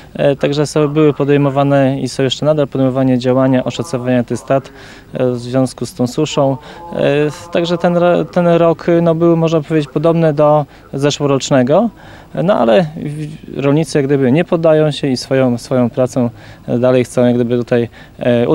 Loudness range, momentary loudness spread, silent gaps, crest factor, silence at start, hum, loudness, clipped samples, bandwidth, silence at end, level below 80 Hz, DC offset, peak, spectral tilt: 4 LU; 8 LU; none; 14 dB; 0 s; none; -14 LUFS; under 0.1%; 16 kHz; 0 s; -46 dBFS; under 0.1%; 0 dBFS; -6.5 dB/octave